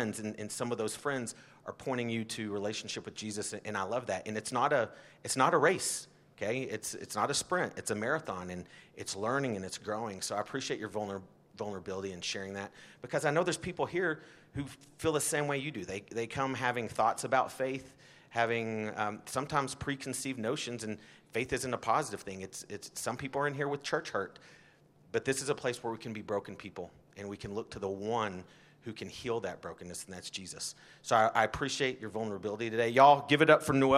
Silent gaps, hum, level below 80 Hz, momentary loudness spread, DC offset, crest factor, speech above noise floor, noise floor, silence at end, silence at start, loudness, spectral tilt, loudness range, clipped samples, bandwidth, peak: none; none; -66 dBFS; 14 LU; under 0.1%; 26 dB; 29 dB; -62 dBFS; 0 s; 0 s; -33 LUFS; -4 dB/octave; 6 LU; under 0.1%; 15.5 kHz; -8 dBFS